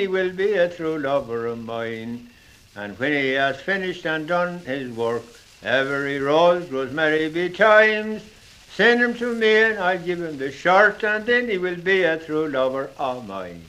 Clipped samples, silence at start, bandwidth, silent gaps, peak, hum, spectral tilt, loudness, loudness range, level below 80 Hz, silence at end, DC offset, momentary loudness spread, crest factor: under 0.1%; 0 s; 14 kHz; none; -2 dBFS; none; -5 dB/octave; -21 LUFS; 6 LU; -58 dBFS; 0 s; under 0.1%; 13 LU; 20 dB